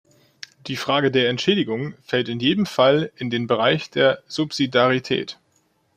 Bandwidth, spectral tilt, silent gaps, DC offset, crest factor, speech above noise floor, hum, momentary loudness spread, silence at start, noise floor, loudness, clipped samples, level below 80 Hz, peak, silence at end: 15.5 kHz; -5.5 dB/octave; none; under 0.1%; 18 dB; 44 dB; none; 11 LU; 0.65 s; -65 dBFS; -21 LUFS; under 0.1%; -62 dBFS; -4 dBFS; 0.65 s